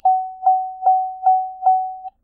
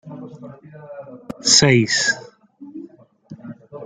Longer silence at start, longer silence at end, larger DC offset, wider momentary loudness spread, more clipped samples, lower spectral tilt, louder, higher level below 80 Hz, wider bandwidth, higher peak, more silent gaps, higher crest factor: about the same, 0.05 s vs 0.05 s; first, 0.15 s vs 0 s; neither; second, 1 LU vs 27 LU; neither; first, -7 dB/octave vs -3 dB/octave; second, -18 LUFS vs -15 LUFS; second, -66 dBFS vs -56 dBFS; second, 1.5 kHz vs 10 kHz; second, -6 dBFS vs 0 dBFS; neither; second, 12 dB vs 22 dB